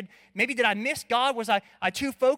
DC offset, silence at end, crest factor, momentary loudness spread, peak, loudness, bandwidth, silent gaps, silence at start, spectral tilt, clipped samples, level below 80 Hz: under 0.1%; 0 s; 18 dB; 5 LU; -10 dBFS; -26 LUFS; 16.5 kHz; none; 0 s; -3 dB/octave; under 0.1%; -64 dBFS